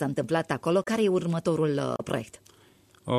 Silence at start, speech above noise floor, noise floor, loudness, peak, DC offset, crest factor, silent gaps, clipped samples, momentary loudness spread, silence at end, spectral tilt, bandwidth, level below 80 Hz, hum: 0 s; 32 dB; -59 dBFS; -27 LUFS; -12 dBFS; under 0.1%; 16 dB; none; under 0.1%; 8 LU; 0 s; -6.5 dB/octave; 14 kHz; -64 dBFS; none